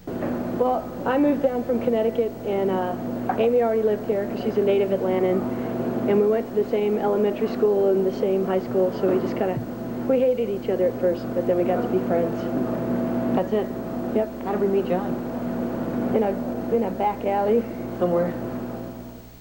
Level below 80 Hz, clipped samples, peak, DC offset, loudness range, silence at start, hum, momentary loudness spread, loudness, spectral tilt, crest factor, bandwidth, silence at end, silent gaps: -50 dBFS; under 0.1%; -8 dBFS; 0.1%; 3 LU; 0 s; none; 7 LU; -24 LUFS; -8 dB/octave; 14 dB; 17 kHz; 0 s; none